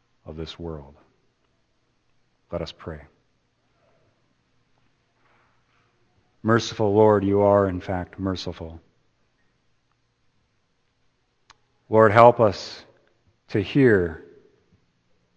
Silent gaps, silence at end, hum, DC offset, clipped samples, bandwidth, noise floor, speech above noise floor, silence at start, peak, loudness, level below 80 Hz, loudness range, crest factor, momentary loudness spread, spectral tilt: none; 1.15 s; none; under 0.1%; under 0.1%; 8.2 kHz; -69 dBFS; 49 dB; 0.3 s; 0 dBFS; -20 LUFS; -54 dBFS; 20 LU; 24 dB; 23 LU; -7 dB/octave